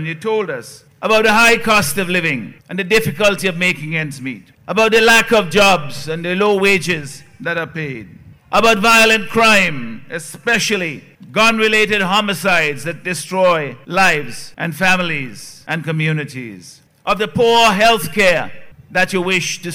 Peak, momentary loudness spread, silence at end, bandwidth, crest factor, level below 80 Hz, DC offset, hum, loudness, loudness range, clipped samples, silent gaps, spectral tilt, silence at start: -4 dBFS; 17 LU; 0 s; 16.5 kHz; 12 dB; -44 dBFS; under 0.1%; none; -14 LUFS; 4 LU; under 0.1%; none; -3.5 dB/octave; 0 s